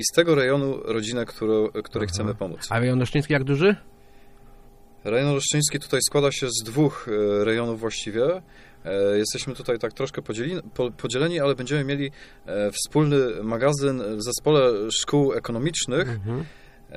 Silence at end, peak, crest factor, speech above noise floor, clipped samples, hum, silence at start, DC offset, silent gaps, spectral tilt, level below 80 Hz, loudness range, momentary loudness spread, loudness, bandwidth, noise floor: 0 s; -4 dBFS; 20 dB; 25 dB; under 0.1%; none; 0 s; under 0.1%; none; -4.5 dB/octave; -50 dBFS; 4 LU; 9 LU; -24 LUFS; 15.5 kHz; -48 dBFS